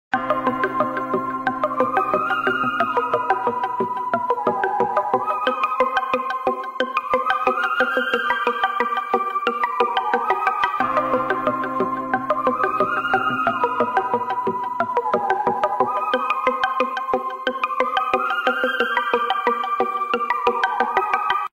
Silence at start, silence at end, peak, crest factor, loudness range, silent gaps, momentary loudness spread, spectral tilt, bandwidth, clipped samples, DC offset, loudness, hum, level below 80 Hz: 0.1 s; 0.05 s; -6 dBFS; 16 dB; 1 LU; none; 4 LU; -5 dB/octave; 15.5 kHz; under 0.1%; under 0.1%; -21 LUFS; none; -58 dBFS